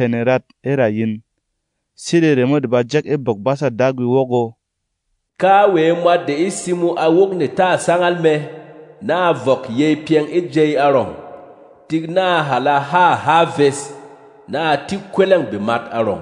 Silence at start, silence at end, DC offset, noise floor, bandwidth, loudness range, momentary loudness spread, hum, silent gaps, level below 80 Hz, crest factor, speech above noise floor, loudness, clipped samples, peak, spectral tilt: 0 s; 0 s; under 0.1%; -74 dBFS; 11 kHz; 2 LU; 9 LU; none; none; -64 dBFS; 16 dB; 59 dB; -16 LUFS; under 0.1%; 0 dBFS; -6 dB/octave